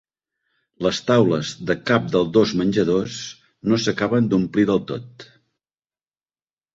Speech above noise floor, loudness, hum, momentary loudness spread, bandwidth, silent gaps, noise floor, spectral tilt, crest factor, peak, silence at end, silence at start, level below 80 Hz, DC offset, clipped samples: over 70 dB; -20 LUFS; none; 12 LU; 7.8 kHz; none; under -90 dBFS; -6 dB/octave; 20 dB; -2 dBFS; 1.5 s; 0.8 s; -54 dBFS; under 0.1%; under 0.1%